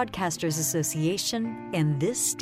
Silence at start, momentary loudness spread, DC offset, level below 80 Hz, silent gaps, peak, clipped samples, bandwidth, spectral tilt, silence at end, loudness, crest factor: 0 s; 3 LU; under 0.1%; -58 dBFS; none; -14 dBFS; under 0.1%; 16 kHz; -4 dB/octave; 0 s; -27 LUFS; 14 dB